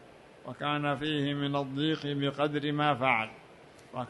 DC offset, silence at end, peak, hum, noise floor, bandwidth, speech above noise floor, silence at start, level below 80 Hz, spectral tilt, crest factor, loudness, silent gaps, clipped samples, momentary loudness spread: under 0.1%; 0 s; -12 dBFS; none; -54 dBFS; 11.5 kHz; 24 dB; 0 s; -68 dBFS; -6.5 dB/octave; 20 dB; -30 LUFS; none; under 0.1%; 11 LU